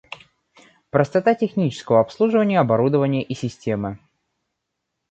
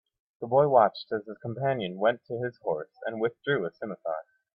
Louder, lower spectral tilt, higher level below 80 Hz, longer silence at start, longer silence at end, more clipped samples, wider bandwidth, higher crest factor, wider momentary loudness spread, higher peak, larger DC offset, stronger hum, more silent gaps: first, -20 LUFS vs -28 LUFS; second, -7.5 dB/octave vs -10 dB/octave; first, -58 dBFS vs -74 dBFS; second, 0.1 s vs 0.4 s; first, 1.15 s vs 0.35 s; neither; first, 8.6 kHz vs 5.8 kHz; about the same, 18 dB vs 22 dB; about the same, 12 LU vs 14 LU; first, -2 dBFS vs -8 dBFS; neither; neither; neither